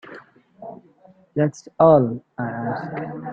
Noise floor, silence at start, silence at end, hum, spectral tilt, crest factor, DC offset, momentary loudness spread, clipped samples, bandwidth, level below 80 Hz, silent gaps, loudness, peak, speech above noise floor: -53 dBFS; 0.05 s; 0 s; none; -8.5 dB/octave; 20 dB; under 0.1%; 25 LU; under 0.1%; 7.6 kHz; -60 dBFS; none; -21 LUFS; -2 dBFS; 33 dB